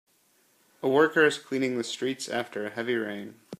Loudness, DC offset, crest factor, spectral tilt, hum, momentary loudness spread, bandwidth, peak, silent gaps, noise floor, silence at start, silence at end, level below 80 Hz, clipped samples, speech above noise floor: -27 LUFS; under 0.1%; 20 dB; -4 dB/octave; none; 11 LU; 15 kHz; -8 dBFS; none; -66 dBFS; 0.85 s; 0.05 s; -78 dBFS; under 0.1%; 39 dB